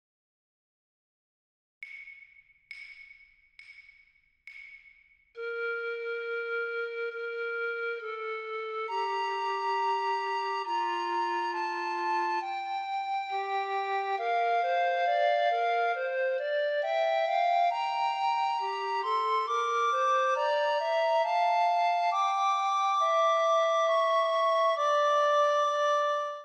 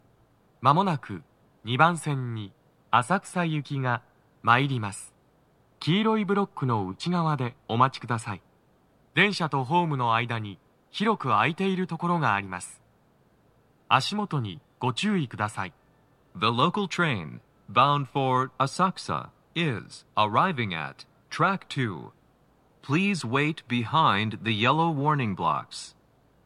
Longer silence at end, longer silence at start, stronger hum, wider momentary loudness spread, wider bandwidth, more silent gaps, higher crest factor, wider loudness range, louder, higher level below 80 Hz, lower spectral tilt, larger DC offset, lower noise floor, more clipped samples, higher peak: second, 0 s vs 0.55 s; first, 1.8 s vs 0.6 s; neither; second, 10 LU vs 14 LU; second, 8.8 kHz vs 13 kHz; neither; second, 14 dB vs 22 dB; first, 21 LU vs 3 LU; about the same, -28 LUFS vs -26 LUFS; second, -86 dBFS vs -68 dBFS; second, 0.5 dB/octave vs -5.5 dB/octave; neither; about the same, -65 dBFS vs -63 dBFS; neither; second, -16 dBFS vs -4 dBFS